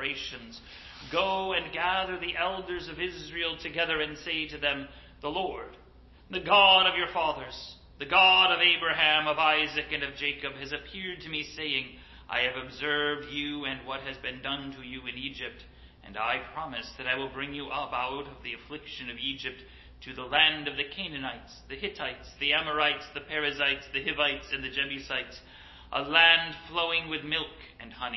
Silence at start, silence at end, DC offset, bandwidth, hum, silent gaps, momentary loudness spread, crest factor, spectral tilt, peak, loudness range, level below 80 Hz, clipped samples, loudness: 0 s; 0 s; under 0.1%; 6.2 kHz; none; none; 19 LU; 24 dB; -3.5 dB/octave; -6 dBFS; 11 LU; -54 dBFS; under 0.1%; -27 LUFS